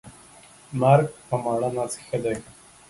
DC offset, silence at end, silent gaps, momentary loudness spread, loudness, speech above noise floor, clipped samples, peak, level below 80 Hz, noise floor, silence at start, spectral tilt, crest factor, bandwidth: under 0.1%; 0.4 s; none; 11 LU; -24 LUFS; 27 dB; under 0.1%; -4 dBFS; -58 dBFS; -50 dBFS; 0.05 s; -6.5 dB/octave; 22 dB; 11.5 kHz